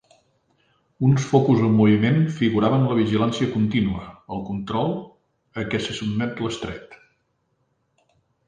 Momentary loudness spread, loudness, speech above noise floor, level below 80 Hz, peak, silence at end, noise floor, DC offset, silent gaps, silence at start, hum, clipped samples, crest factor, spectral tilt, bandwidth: 16 LU; -21 LUFS; 49 dB; -50 dBFS; -4 dBFS; 1.5 s; -70 dBFS; under 0.1%; none; 1 s; none; under 0.1%; 20 dB; -7 dB/octave; 9.4 kHz